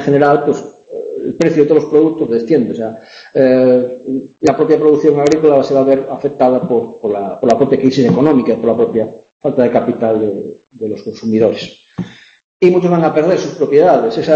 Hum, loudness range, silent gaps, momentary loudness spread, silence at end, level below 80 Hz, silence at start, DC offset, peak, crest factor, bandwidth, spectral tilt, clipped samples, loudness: none; 4 LU; 9.32-9.40 s, 12.44-12.60 s; 14 LU; 0 s; -54 dBFS; 0 s; under 0.1%; 0 dBFS; 12 dB; 8 kHz; -7.5 dB/octave; under 0.1%; -13 LUFS